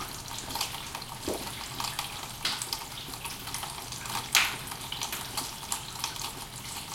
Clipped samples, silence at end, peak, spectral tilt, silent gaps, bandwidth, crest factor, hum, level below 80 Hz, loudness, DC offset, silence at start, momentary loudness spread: under 0.1%; 0 s; -2 dBFS; -1 dB/octave; none; 17 kHz; 32 dB; none; -54 dBFS; -33 LUFS; under 0.1%; 0 s; 10 LU